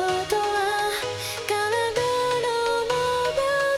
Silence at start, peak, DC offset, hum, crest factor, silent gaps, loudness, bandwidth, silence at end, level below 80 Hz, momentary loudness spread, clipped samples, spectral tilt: 0 s; -8 dBFS; under 0.1%; none; 16 dB; none; -24 LUFS; 16.5 kHz; 0 s; -54 dBFS; 3 LU; under 0.1%; -2.5 dB/octave